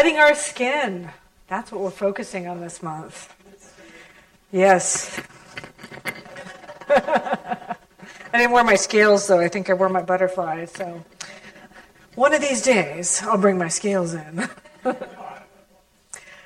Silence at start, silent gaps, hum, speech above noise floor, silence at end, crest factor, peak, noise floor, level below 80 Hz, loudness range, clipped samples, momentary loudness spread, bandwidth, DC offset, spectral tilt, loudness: 0 s; none; none; 37 dB; 0.15 s; 22 dB; 0 dBFS; -58 dBFS; -60 dBFS; 8 LU; under 0.1%; 23 LU; 15.5 kHz; under 0.1%; -3.5 dB/octave; -20 LUFS